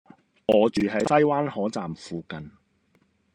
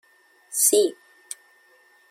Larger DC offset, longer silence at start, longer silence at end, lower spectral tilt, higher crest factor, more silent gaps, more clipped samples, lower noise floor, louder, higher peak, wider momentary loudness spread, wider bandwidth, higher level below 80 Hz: neither; about the same, 0.5 s vs 0.5 s; second, 0.85 s vs 1.2 s; first, -6 dB/octave vs -0.5 dB/octave; about the same, 20 dB vs 22 dB; neither; neither; first, -66 dBFS vs -58 dBFS; second, -24 LUFS vs -20 LUFS; about the same, -6 dBFS vs -4 dBFS; second, 15 LU vs 22 LU; second, 10.5 kHz vs 16.5 kHz; first, -60 dBFS vs -78 dBFS